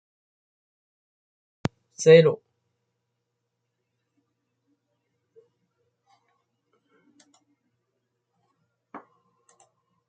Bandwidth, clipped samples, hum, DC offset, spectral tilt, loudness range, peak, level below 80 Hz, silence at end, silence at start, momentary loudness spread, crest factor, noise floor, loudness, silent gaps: 9 kHz; under 0.1%; none; under 0.1%; -5.5 dB/octave; 1 LU; -4 dBFS; -72 dBFS; 1.1 s; 2 s; 19 LU; 26 dB; -80 dBFS; -20 LUFS; none